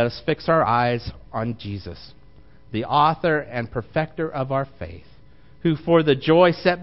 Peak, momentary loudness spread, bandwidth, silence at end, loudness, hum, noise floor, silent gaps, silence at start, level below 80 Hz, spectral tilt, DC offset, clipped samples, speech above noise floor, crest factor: -4 dBFS; 15 LU; 5.8 kHz; 0 s; -21 LUFS; none; -51 dBFS; none; 0 s; -48 dBFS; -10 dB/octave; 0.5%; under 0.1%; 30 dB; 18 dB